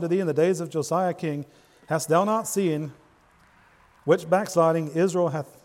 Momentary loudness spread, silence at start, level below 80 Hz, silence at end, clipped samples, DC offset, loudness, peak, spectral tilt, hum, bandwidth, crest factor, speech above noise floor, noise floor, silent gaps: 9 LU; 0 s; -70 dBFS; 0.15 s; under 0.1%; under 0.1%; -24 LUFS; -8 dBFS; -6 dB/octave; none; 16 kHz; 18 dB; 34 dB; -58 dBFS; none